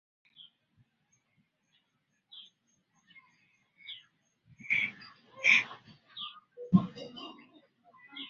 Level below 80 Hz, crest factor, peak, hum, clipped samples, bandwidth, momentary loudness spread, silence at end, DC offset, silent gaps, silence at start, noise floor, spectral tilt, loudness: -74 dBFS; 26 dB; -10 dBFS; none; under 0.1%; 7 kHz; 28 LU; 0 s; under 0.1%; none; 2.35 s; -78 dBFS; -3.5 dB/octave; -29 LUFS